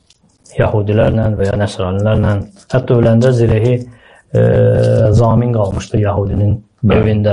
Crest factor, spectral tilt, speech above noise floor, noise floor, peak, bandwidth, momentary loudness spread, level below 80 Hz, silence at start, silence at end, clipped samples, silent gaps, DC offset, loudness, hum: 10 dB; -8.5 dB/octave; 37 dB; -48 dBFS; -2 dBFS; 10.5 kHz; 7 LU; -32 dBFS; 0.55 s; 0 s; under 0.1%; none; under 0.1%; -13 LUFS; none